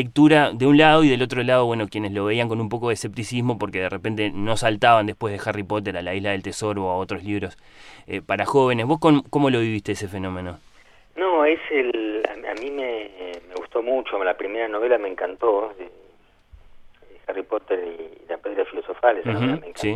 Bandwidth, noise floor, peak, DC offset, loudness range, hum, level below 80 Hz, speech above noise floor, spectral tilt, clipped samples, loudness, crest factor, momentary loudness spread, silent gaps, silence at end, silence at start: 12.5 kHz; -54 dBFS; -2 dBFS; under 0.1%; 6 LU; none; -52 dBFS; 33 dB; -6 dB/octave; under 0.1%; -22 LUFS; 20 dB; 15 LU; none; 0 s; 0 s